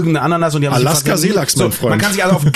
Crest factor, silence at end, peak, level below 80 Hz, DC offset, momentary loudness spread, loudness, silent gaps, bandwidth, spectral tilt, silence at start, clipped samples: 12 dB; 0 s; -2 dBFS; -46 dBFS; under 0.1%; 2 LU; -14 LUFS; none; 14 kHz; -4.5 dB/octave; 0 s; under 0.1%